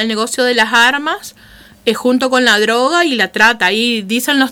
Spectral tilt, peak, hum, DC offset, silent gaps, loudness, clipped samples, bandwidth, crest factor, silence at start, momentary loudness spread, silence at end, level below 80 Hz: -2.5 dB/octave; 0 dBFS; none; under 0.1%; none; -12 LUFS; under 0.1%; 18.5 kHz; 14 dB; 0 s; 9 LU; 0 s; -54 dBFS